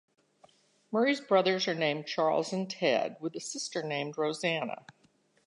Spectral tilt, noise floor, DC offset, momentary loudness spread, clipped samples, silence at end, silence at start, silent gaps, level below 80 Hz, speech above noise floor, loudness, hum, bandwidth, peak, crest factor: -4 dB/octave; -68 dBFS; under 0.1%; 10 LU; under 0.1%; 0.7 s; 0.9 s; none; -86 dBFS; 38 dB; -31 LUFS; none; 11 kHz; -12 dBFS; 18 dB